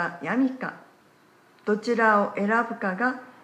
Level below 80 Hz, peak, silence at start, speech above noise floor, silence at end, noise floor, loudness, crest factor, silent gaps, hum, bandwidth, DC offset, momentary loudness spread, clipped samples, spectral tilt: -82 dBFS; -8 dBFS; 0 s; 33 dB; 0.15 s; -58 dBFS; -25 LUFS; 18 dB; none; none; 9.8 kHz; under 0.1%; 12 LU; under 0.1%; -6.5 dB/octave